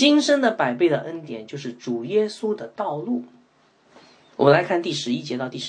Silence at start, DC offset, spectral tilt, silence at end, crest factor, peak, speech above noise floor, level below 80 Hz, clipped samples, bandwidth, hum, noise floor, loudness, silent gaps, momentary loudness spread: 0 s; under 0.1%; -5 dB/octave; 0 s; 20 dB; -2 dBFS; 37 dB; -72 dBFS; under 0.1%; 9.8 kHz; none; -59 dBFS; -22 LUFS; none; 15 LU